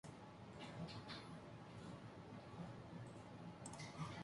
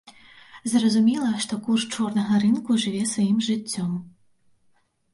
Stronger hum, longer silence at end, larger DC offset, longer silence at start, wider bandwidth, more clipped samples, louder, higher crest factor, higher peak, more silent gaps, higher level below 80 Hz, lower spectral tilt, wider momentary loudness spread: neither; second, 0 s vs 1.05 s; neither; second, 0.05 s vs 0.55 s; about the same, 11.5 kHz vs 11.5 kHz; neither; second, -55 LUFS vs -23 LUFS; about the same, 18 dB vs 14 dB; second, -36 dBFS vs -10 dBFS; neither; second, -72 dBFS vs -66 dBFS; about the same, -5.5 dB/octave vs -4.5 dB/octave; second, 5 LU vs 8 LU